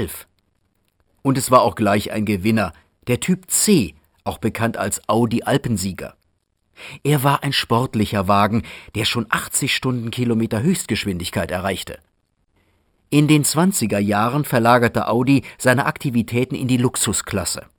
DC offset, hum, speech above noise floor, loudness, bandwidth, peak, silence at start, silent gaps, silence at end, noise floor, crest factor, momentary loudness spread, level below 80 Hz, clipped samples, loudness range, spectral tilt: under 0.1%; none; 48 dB; -19 LUFS; over 20 kHz; 0 dBFS; 0 s; none; 0.2 s; -67 dBFS; 18 dB; 11 LU; -48 dBFS; under 0.1%; 4 LU; -4.5 dB/octave